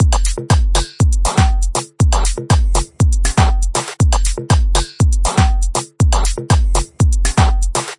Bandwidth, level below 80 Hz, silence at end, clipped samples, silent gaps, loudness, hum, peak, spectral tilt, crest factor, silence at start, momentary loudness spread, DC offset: 11.5 kHz; -16 dBFS; 0.05 s; under 0.1%; none; -16 LUFS; none; 0 dBFS; -4.5 dB/octave; 14 dB; 0 s; 4 LU; under 0.1%